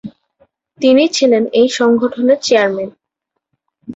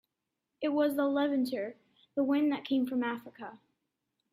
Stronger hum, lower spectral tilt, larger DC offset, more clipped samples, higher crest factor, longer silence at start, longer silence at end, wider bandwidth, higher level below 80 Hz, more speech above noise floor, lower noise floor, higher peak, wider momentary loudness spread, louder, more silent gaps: neither; second, -3.5 dB/octave vs -5.5 dB/octave; neither; neither; about the same, 14 dB vs 16 dB; second, 0.05 s vs 0.6 s; second, 0 s vs 0.75 s; second, 8 kHz vs 14.5 kHz; first, -60 dBFS vs -80 dBFS; first, 64 dB vs 56 dB; second, -76 dBFS vs -86 dBFS; first, -2 dBFS vs -16 dBFS; second, 6 LU vs 13 LU; first, -13 LUFS vs -32 LUFS; neither